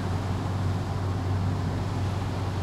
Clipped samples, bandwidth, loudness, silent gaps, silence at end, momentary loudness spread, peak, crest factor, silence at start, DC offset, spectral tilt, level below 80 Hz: under 0.1%; 12 kHz; -29 LUFS; none; 0 s; 2 LU; -16 dBFS; 10 dB; 0 s; under 0.1%; -7 dB/octave; -42 dBFS